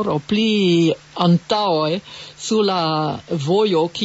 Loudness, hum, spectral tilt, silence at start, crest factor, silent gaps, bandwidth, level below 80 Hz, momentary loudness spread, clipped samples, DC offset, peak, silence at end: -18 LUFS; none; -6 dB/octave; 0 s; 14 dB; none; 8 kHz; -58 dBFS; 8 LU; under 0.1%; under 0.1%; -4 dBFS; 0 s